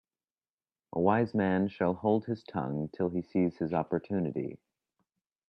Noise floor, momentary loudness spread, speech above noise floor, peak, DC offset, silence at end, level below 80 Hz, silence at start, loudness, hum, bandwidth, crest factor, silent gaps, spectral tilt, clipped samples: under -90 dBFS; 8 LU; over 60 dB; -12 dBFS; under 0.1%; 0.95 s; -68 dBFS; 0.95 s; -31 LUFS; none; 5.8 kHz; 20 dB; none; -10 dB/octave; under 0.1%